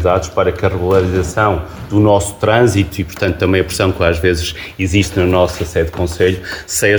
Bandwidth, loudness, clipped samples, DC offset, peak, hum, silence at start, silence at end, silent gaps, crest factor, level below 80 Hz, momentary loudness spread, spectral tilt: over 20 kHz; -15 LUFS; under 0.1%; under 0.1%; 0 dBFS; none; 0 s; 0 s; none; 14 dB; -30 dBFS; 7 LU; -5.5 dB/octave